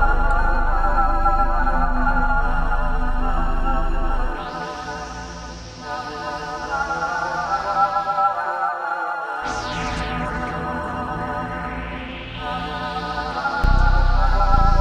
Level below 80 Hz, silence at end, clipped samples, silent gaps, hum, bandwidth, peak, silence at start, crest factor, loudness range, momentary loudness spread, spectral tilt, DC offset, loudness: -22 dBFS; 0 s; under 0.1%; none; none; 7.6 kHz; -4 dBFS; 0 s; 16 dB; 5 LU; 10 LU; -5.5 dB/octave; under 0.1%; -23 LUFS